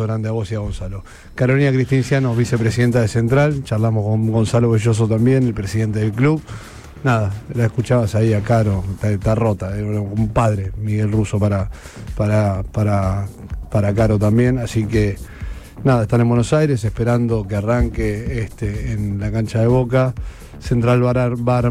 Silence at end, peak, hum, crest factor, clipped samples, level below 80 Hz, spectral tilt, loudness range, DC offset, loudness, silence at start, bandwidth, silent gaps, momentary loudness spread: 0 s; -4 dBFS; none; 12 dB; under 0.1%; -34 dBFS; -7.5 dB/octave; 3 LU; under 0.1%; -18 LUFS; 0 s; 12.5 kHz; none; 9 LU